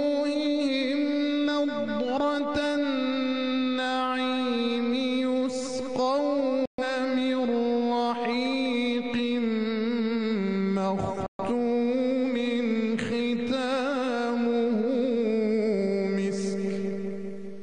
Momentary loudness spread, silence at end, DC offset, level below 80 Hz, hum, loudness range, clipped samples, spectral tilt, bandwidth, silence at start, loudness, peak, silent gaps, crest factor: 3 LU; 0 s; 0.2%; -62 dBFS; none; 1 LU; under 0.1%; -5.5 dB/octave; 10 kHz; 0 s; -27 LUFS; -14 dBFS; 6.67-6.78 s, 11.28-11.39 s; 12 dB